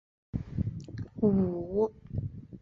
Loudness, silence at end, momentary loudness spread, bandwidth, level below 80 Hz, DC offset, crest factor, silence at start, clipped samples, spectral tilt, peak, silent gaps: -32 LUFS; 0 s; 14 LU; 6.6 kHz; -48 dBFS; under 0.1%; 18 dB; 0.35 s; under 0.1%; -11 dB/octave; -14 dBFS; none